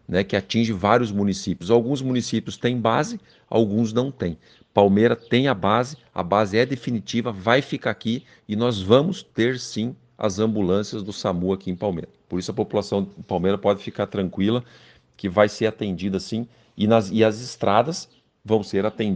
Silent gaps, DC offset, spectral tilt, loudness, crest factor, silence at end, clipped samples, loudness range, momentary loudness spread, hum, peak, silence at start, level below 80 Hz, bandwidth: none; under 0.1%; -6 dB/octave; -23 LUFS; 22 dB; 0 s; under 0.1%; 4 LU; 10 LU; none; 0 dBFS; 0.1 s; -56 dBFS; 9.4 kHz